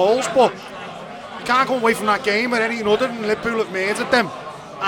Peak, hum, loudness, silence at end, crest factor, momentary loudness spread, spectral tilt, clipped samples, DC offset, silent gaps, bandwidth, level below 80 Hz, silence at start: -2 dBFS; none; -19 LUFS; 0 s; 18 dB; 16 LU; -3.5 dB/octave; under 0.1%; under 0.1%; none; 19 kHz; -56 dBFS; 0 s